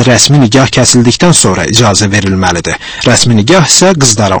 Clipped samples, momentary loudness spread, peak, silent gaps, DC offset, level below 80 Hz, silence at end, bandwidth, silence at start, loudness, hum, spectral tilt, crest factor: 3%; 6 LU; 0 dBFS; none; under 0.1%; -32 dBFS; 0 s; 11 kHz; 0 s; -6 LUFS; none; -3.5 dB/octave; 6 dB